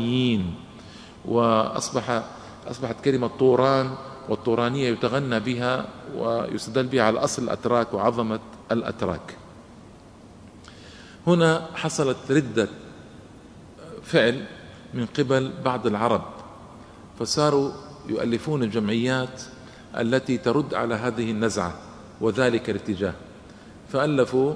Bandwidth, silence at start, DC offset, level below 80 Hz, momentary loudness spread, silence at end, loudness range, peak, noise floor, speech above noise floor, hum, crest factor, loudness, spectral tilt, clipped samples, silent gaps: 11 kHz; 0 s; under 0.1%; -56 dBFS; 21 LU; 0 s; 3 LU; -2 dBFS; -47 dBFS; 23 dB; none; 22 dB; -24 LUFS; -5.5 dB/octave; under 0.1%; none